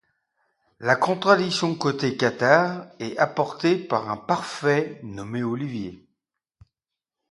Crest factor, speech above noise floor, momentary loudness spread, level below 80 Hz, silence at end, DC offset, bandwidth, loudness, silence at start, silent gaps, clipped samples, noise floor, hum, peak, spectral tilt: 24 dB; 65 dB; 14 LU; -64 dBFS; 1.35 s; under 0.1%; 11.5 kHz; -23 LUFS; 0.8 s; none; under 0.1%; -88 dBFS; none; 0 dBFS; -5.5 dB/octave